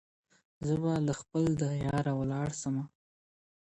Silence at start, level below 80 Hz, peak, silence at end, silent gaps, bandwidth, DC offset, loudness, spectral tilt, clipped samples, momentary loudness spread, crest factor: 0.6 s; -56 dBFS; -18 dBFS; 0.8 s; none; 11 kHz; under 0.1%; -32 LUFS; -7 dB/octave; under 0.1%; 7 LU; 14 dB